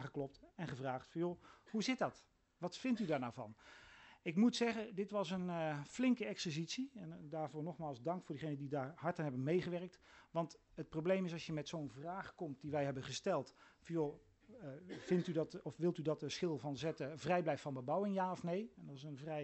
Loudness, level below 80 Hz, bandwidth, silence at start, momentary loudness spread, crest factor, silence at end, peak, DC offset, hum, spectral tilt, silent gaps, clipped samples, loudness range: -42 LUFS; -76 dBFS; 8.2 kHz; 0 s; 13 LU; 18 dB; 0 s; -24 dBFS; under 0.1%; none; -6 dB/octave; none; under 0.1%; 4 LU